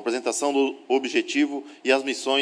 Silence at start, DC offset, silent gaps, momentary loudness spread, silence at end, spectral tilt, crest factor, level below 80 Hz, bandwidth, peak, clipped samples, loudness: 0 s; under 0.1%; none; 3 LU; 0 s; -1.5 dB/octave; 18 dB; -88 dBFS; 10.5 kHz; -6 dBFS; under 0.1%; -24 LUFS